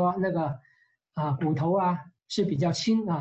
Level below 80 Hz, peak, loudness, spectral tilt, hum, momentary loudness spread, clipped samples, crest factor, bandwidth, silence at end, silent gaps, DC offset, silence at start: -64 dBFS; -16 dBFS; -27 LUFS; -6.5 dB/octave; none; 9 LU; under 0.1%; 12 dB; 8.4 kHz; 0 s; none; under 0.1%; 0 s